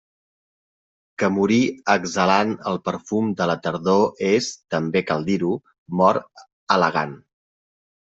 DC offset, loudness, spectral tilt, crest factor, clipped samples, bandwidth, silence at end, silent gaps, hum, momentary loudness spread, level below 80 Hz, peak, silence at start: under 0.1%; -21 LUFS; -5.5 dB/octave; 20 dB; under 0.1%; 8 kHz; 0.85 s; 5.78-5.86 s, 6.53-6.67 s; none; 8 LU; -62 dBFS; -2 dBFS; 1.2 s